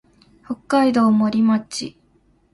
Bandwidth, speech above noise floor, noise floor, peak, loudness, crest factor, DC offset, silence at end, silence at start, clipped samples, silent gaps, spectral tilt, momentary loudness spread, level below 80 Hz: 11.5 kHz; 41 dB; -59 dBFS; -4 dBFS; -18 LUFS; 16 dB; under 0.1%; 0.65 s; 0.5 s; under 0.1%; none; -5.5 dB/octave; 17 LU; -60 dBFS